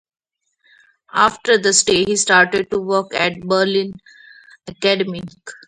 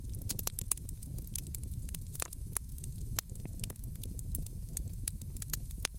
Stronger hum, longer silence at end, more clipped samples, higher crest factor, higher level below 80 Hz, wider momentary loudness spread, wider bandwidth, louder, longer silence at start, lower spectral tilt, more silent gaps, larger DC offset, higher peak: neither; first, 0.15 s vs 0 s; neither; second, 18 dB vs 32 dB; second, -56 dBFS vs -44 dBFS; first, 11 LU vs 7 LU; second, 11 kHz vs 17 kHz; first, -16 LUFS vs -40 LUFS; first, 1.15 s vs 0 s; about the same, -2.5 dB/octave vs -3 dB/octave; neither; neither; first, 0 dBFS vs -8 dBFS